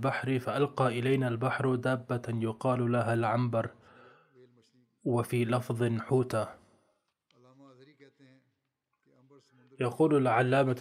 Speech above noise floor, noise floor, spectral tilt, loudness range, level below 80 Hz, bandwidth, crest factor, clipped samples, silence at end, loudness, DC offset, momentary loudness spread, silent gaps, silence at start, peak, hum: 53 dB; -82 dBFS; -7.5 dB/octave; 7 LU; -76 dBFS; 14.5 kHz; 18 dB; under 0.1%; 0 s; -30 LUFS; under 0.1%; 8 LU; none; 0 s; -14 dBFS; none